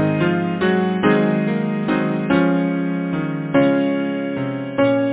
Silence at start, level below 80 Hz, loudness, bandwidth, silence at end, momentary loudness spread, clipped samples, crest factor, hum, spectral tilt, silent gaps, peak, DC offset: 0 s; -52 dBFS; -19 LUFS; 4 kHz; 0 s; 6 LU; under 0.1%; 16 dB; none; -11.5 dB/octave; none; -2 dBFS; under 0.1%